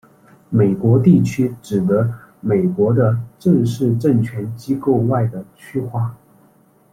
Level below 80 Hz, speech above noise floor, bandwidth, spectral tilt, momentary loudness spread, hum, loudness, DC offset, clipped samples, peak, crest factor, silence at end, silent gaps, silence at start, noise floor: -52 dBFS; 37 dB; 14 kHz; -9 dB/octave; 11 LU; none; -18 LUFS; under 0.1%; under 0.1%; -2 dBFS; 16 dB; 0.8 s; none; 0.5 s; -53 dBFS